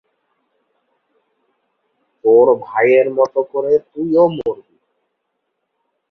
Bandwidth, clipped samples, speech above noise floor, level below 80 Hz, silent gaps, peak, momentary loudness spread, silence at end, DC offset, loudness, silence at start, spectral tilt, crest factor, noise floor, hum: 6.2 kHz; under 0.1%; 59 dB; -62 dBFS; none; -2 dBFS; 10 LU; 1.55 s; under 0.1%; -15 LUFS; 2.25 s; -8 dB/octave; 16 dB; -73 dBFS; none